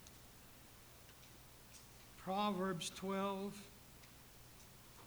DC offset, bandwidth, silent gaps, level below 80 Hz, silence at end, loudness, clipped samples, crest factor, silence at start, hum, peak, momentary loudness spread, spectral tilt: under 0.1%; over 20 kHz; none; -70 dBFS; 0 s; -42 LUFS; under 0.1%; 20 dB; 0 s; none; -28 dBFS; 19 LU; -4.5 dB/octave